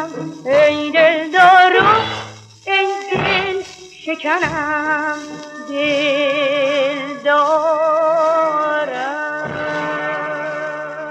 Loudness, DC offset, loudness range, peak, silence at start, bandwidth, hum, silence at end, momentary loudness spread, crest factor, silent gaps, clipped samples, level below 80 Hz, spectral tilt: -16 LUFS; under 0.1%; 5 LU; 0 dBFS; 0 s; 10 kHz; none; 0 s; 14 LU; 16 dB; none; under 0.1%; -56 dBFS; -4 dB/octave